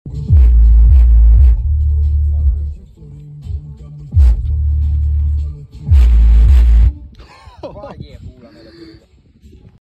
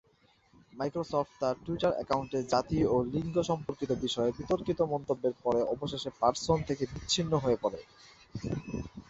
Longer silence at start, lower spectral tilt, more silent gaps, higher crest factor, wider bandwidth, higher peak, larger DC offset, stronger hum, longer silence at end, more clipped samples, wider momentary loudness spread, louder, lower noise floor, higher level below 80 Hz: second, 0.05 s vs 0.75 s; first, -9 dB/octave vs -5.5 dB/octave; neither; second, 10 dB vs 20 dB; second, 2.9 kHz vs 8.2 kHz; first, -2 dBFS vs -12 dBFS; neither; neither; first, 1 s vs 0.1 s; neither; first, 23 LU vs 8 LU; first, -12 LUFS vs -32 LUFS; second, -46 dBFS vs -67 dBFS; first, -12 dBFS vs -54 dBFS